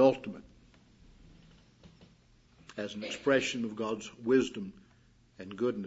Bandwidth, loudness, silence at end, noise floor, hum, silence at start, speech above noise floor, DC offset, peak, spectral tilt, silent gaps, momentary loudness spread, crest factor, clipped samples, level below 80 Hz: 8 kHz; -32 LUFS; 0 s; -63 dBFS; none; 0 s; 31 dB; under 0.1%; -12 dBFS; -5 dB/octave; none; 18 LU; 22 dB; under 0.1%; -66 dBFS